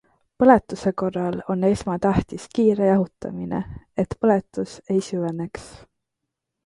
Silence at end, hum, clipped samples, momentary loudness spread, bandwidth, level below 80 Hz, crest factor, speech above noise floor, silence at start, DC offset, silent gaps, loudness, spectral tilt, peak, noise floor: 0.9 s; none; under 0.1%; 14 LU; 11.5 kHz; -46 dBFS; 20 dB; 60 dB; 0.4 s; under 0.1%; none; -22 LUFS; -7.5 dB/octave; -2 dBFS; -82 dBFS